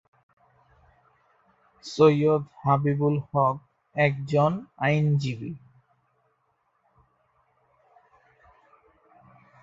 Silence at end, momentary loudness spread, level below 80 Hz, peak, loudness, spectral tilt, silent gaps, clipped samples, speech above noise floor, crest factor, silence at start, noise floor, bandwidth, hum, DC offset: 4.05 s; 17 LU; -64 dBFS; -6 dBFS; -24 LUFS; -7.5 dB/octave; none; under 0.1%; 48 dB; 22 dB; 1.85 s; -72 dBFS; 7.6 kHz; none; under 0.1%